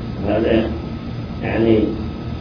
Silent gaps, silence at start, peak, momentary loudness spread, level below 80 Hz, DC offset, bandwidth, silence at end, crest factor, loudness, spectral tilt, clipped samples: none; 0 s; -2 dBFS; 12 LU; -32 dBFS; under 0.1%; 5.4 kHz; 0 s; 18 dB; -20 LUFS; -9 dB/octave; under 0.1%